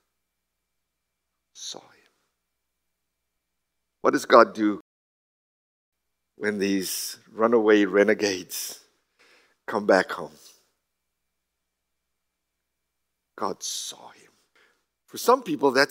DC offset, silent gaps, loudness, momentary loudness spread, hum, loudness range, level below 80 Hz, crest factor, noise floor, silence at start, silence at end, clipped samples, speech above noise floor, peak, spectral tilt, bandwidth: under 0.1%; 4.80-5.92 s; -23 LUFS; 19 LU; none; 17 LU; -80 dBFS; 26 dB; -82 dBFS; 1.55 s; 0.05 s; under 0.1%; 59 dB; -2 dBFS; -3.5 dB/octave; 16 kHz